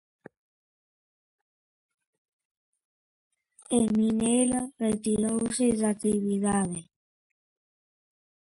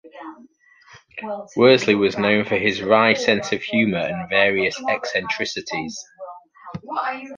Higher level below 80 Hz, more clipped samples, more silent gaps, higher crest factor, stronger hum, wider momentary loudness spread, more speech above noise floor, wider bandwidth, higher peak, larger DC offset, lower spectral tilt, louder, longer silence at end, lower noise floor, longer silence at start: about the same, -60 dBFS vs -58 dBFS; neither; neither; about the same, 18 dB vs 20 dB; neither; second, 5 LU vs 22 LU; first, over 64 dB vs 30 dB; first, 11.5 kHz vs 9.4 kHz; second, -12 dBFS vs -2 dBFS; neither; about the same, -5 dB/octave vs -4.5 dB/octave; second, -26 LUFS vs -19 LUFS; first, 1.75 s vs 0 s; first, under -90 dBFS vs -50 dBFS; first, 3.7 s vs 0.05 s